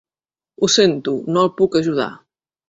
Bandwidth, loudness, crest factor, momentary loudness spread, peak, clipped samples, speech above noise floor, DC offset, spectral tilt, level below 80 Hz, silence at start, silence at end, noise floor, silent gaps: 8 kHz; -17 LUFS; 16 dB; 9 LU; -2 dBFS; under 0.1%; over 73 dB; under 0.1%; -4 dB/octave; -58 dBFS; 0.6 s; 0.55 s; under -90 dBFS; none